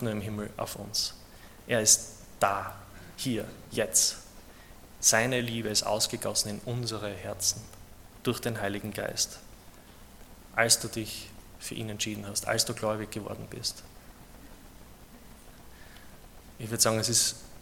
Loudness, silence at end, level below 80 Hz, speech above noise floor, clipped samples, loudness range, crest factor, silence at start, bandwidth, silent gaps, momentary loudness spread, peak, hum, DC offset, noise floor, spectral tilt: -28 LUFS; 0 s; -54 dBFS; 21 dB; under 0.1%; 7 LU; 24 dB; 0 s; 17.5 kHz; none; 17 LU; -8 dBFS; none; under 0.1%; -51 dBFS; -2 dB/octave